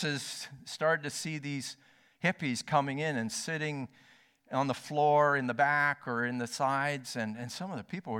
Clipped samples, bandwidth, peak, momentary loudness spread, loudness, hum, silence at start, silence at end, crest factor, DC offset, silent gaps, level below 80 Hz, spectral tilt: under 0.1%; 17 kHz; -14 dBFS; 13 LU; -32 LUFS; none; 0 s; 0 s; 20 dB; under 0.1%; none; -76 dBFS; -4.5 dB/octave